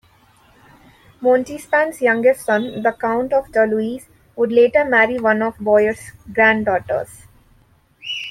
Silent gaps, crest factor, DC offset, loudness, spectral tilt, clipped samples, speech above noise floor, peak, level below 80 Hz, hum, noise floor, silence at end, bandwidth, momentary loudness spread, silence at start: none; 16 dB; under 0.1%; -17 LUFS; -5 dB/octave; under 0.1%; 38 dB; -2 dBFS; -54 dBFS; none; -55 dBFS; 0 s; 14.5 kHz; 12 LU; 1.2 s